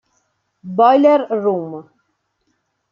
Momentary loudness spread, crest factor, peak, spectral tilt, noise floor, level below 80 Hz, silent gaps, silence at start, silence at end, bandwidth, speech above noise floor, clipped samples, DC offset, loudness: 18 LU; 16 dB; -2 dBFS; -8 dB/octave; -68 dBFS; -72 dBFS; none; 0.65 s; 1.1 s; 6.8 kHz; 54 dB; under 0.1%; under 0.1%; -15 LUFS